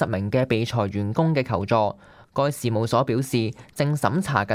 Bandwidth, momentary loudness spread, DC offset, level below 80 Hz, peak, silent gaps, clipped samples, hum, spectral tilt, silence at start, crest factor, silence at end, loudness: 15.5 kHz; 5 LU; under 0.1%; -54 dBFS; -4 dBFS; none; under 0.1%; none; -6.5 dB/octave; 0 s; 18 dB; 0 s; -24 LUFS